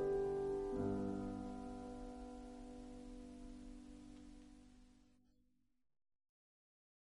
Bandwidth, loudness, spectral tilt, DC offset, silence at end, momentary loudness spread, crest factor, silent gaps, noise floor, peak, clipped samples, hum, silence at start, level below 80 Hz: 11.5 kHz; -46 LUFS; -7.5 dB/octave; under 0.1%; 2.1 s; 19 LU; 18 dB; none; -81 dBFS; -30 dBFS; under 0.1%; none; 0 s; -60 dBFS